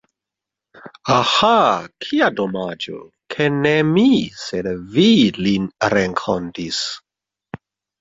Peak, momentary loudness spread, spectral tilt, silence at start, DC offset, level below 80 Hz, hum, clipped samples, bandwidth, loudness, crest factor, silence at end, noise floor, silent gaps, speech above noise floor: -2 dBFS; 16 LU; -5 dB/octave; 0.85 s; under 0.1%; -52 dBFS; none; under 0.1%; 7.8 kHz; -17 LUFS; 16 dB; 0.45 s; -85 dBFS; none; 68 dB